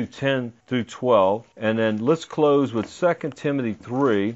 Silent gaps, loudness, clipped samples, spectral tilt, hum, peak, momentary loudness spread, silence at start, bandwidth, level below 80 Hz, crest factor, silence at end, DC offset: none; -23 LUFS; under 0.1%; -6.5 dB/octave; none; -6 dBFS; 8 LU; 0 s; 8 kHz; -66 dBFS; 16 dB; 0 s; under 0.1%